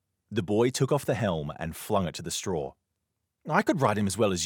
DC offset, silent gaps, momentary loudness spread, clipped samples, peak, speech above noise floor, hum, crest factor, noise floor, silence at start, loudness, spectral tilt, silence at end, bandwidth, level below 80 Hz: under 0.1%; none; 10 LU; under 0.1%; -6 dBFS; 54 dB; none; 22 dB; -82 dBFS; 0.3 s; -28 LUFS; -5 dB/octave; 0 s; 19 kHz; -60 dBFS